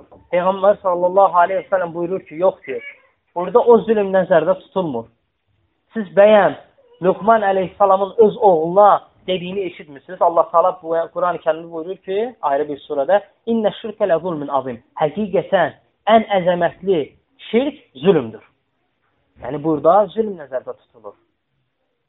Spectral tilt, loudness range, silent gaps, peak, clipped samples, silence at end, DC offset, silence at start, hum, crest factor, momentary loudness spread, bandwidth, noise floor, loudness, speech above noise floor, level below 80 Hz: -4.5 dB/octave; 5 LU; none; 0 dBFS; under 0.1%; 1 s; under 0.1%; 0.3 s; none; 18 dB; 15 LU; 4 kHz; -70 dBFS; -17 LUFS; 53 dB; -60 dBFS